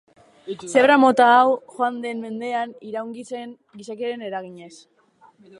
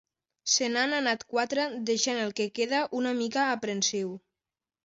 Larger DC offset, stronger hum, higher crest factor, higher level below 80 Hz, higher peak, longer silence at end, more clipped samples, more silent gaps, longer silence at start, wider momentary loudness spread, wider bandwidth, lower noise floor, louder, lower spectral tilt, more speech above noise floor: neither; neither; about the same, 18 dB vs 18 dB; about the same, -72 dBFS vs -76 dBFS; first, -2 dBFS vs -12 dBFS; first, 0.85 s vs 0.65 s; neither; neither; about the same, 0.45 s vs 0.45 s; first, 21 LU vs 5 LU; first, 11.5 kHz vs 8 kHz; second, -55 dBFS vs under -90 dBFS; first, -20 LUFS vs -28 LUFS; first, -4 dB/octave vs -2 dB/octave; second, 34 dB vs over 61 dB